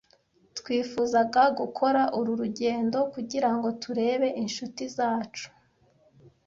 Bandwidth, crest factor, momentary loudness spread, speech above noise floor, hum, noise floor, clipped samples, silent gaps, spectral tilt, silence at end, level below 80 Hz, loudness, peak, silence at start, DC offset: 7.6 kHz; 18 dB; 11 LU; 38 dB; none; -64 dBFS; under 0.1%; none; -4.5 dB/octave; 0.2 s; -68 dBFS; -27 LUFS; -10 dBFS; 0.55 s; under 0.1%